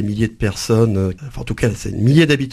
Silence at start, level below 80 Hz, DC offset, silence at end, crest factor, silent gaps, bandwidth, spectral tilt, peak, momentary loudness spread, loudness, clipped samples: 0 s; -36 dBFS; under 0.1%; 0 s; 16 dB; none; 14 kHz; -6.5 dB/octave; 0 dBFS; 10 LU; -17 LUFS; under 0.1%